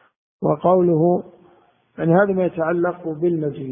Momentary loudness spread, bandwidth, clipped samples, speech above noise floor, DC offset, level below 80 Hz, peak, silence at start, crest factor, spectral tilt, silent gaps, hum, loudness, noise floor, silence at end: 8 LU; 3.6 kHz; under 0.1%; 38 dB; under 0.1%; -58 dBFS; -2 dBFS; 0.4 s; 18 dB; -13.5 dB/octave; none; none; -19 LUFS; -56 dBFS; 0 s